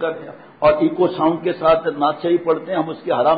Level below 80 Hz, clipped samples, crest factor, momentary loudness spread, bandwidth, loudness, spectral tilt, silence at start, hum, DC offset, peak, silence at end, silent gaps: -52 dBFS; under 0.1%; 14 dB; 7 LU; 5 kHz; -18 LUFS; -11 dB/octave; 0 s; none; under 0.1%; -4 dBFS; 0 s; none